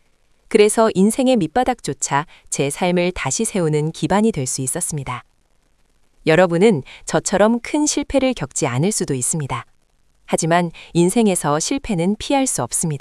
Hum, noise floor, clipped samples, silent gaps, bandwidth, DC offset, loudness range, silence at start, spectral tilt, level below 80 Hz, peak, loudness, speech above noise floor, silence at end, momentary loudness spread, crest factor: none; -56 dBFS; under 0.1%; none; 12 kHz; under 0.1%; 3 LU; 0.5 s; -4.5 dB/octave; -44 dBFS; 0 dBFS; -18 LUFS; 38 dB; 0 s; 8 LU; 18 dB